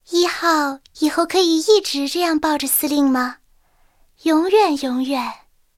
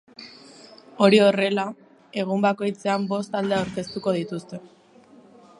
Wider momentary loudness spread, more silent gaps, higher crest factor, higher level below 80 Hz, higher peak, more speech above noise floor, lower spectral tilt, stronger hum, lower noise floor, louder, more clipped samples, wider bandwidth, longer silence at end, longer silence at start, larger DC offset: second, 8 LU vs 23 LU; neither; second, 16 dB vs 22 dB; first, -56 dBFS vs -64 dBFS; about the same, -2 dBFS vs -2 dBFS; first, 38 dB vs 30 dB; second, -1.5 dB/octave vs -6 dB/octave; neither; first, -56 dBFS vs -52 dBFS; first, -18 LUFS vs -23 LUFS; neither; first, 17 kHz vs 11 kHz; second, 0.45 s vs 0.95 s; about the same, 0.1 s vs 0.2 s; neither